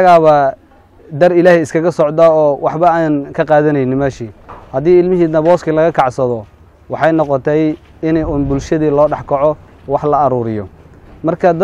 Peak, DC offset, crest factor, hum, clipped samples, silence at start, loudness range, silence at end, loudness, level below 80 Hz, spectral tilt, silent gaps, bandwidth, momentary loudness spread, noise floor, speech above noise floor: 0 dBFS; under 0.1%; 12 dB; none; under 0.1%; 0 s; 3 LU; 0 s; -13 LUFS; -38 dBFS; -7.5 dB/octave; none; 11 kHz; 11 LU; -42 dBFS; 30 dB